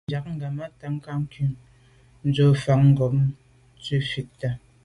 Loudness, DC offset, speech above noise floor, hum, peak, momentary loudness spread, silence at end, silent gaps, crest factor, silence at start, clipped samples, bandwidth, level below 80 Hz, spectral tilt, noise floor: -24 LUFS; under 0.1%; 32 dB; none; -8 dBFS; 14 LU; 0.25 s; none; 16 dB; 0.1 s; under 0.1%; 10.5 kHz; -52 dBFS; -8 dB/octave; -55 dBFS